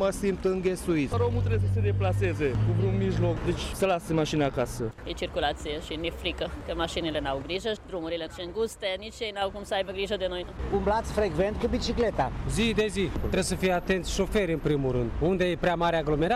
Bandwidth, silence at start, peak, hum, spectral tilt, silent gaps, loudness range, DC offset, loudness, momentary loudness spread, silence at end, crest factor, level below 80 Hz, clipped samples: 14 kHz; 0 s; -14 dBFS; none; -6 dB/octave; none; 5 LU; under 0.1%; -28 LUFS; 7 LU; 0 s; 14 dB; -40 dBFS; under 0.1%